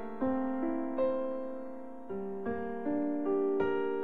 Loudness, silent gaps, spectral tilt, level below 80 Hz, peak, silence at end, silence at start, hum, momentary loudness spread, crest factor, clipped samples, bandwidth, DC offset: -34 LUFS; none; -9 dB/octave; -64 dBFS; -20 dBFS; 0 s; 0 s; none; 11 LU; 14 dB; under 0.1%; 4.6 kHz; 0.7%